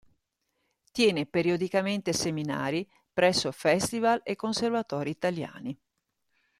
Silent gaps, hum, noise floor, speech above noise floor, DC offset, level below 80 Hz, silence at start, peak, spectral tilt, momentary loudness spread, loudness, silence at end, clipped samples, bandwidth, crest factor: none; none; -79 dBFS; 51 dB; under 0.1%; -64 dBFS; 0.95 s; -10 dBFS; -4.5 dB/octave; 11 LU; -28 LUFS; 0.85 s; under 0.1%; 14.5 kHz; 20 dB